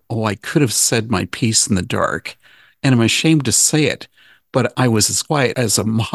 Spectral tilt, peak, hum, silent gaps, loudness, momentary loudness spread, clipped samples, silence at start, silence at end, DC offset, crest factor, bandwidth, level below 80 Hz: -3.5 dB/octave; 0 dBFS; none; none; -16 LUFS; 8 LU; under 0.1%; 0.1 s; 0 s; under 0.1%; 16 dB; 13 kHz; -44 dBFS